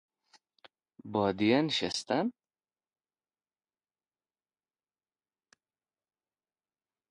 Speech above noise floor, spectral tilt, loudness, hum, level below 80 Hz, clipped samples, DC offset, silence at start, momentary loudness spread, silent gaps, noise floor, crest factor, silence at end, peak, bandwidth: over 61 dB; -5 dB/octave; -30 LUFS; none; -70 dBFS; under 0.1%; under 0.1%; 1.05 s; 10 LU; none; under -90 dBFS; 24 dB; 4.8 s; -12 dBFS; 11 kHz